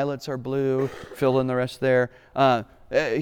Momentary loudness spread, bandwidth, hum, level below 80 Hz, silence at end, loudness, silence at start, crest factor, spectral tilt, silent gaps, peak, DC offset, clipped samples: 7 LU; 18.5 kHz; none; -56 dBFS; 0 s; -24 LUFS; 0 s; 16 dB; -6.5 dB/octave; none; -8 dBFS; under 0.1%; under 0.1%